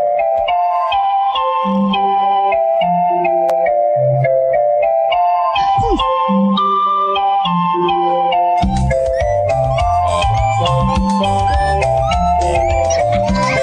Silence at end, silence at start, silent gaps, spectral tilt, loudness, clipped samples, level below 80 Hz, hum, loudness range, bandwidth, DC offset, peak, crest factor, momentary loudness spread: 0 s; 0 s; none; -6 dB/octave; -14 LUFS; under 0.1%; -28 dBFS; none; 1 LU; 10 kHz; under 0.1%; -2 dBFS; 12 dB; 2 LU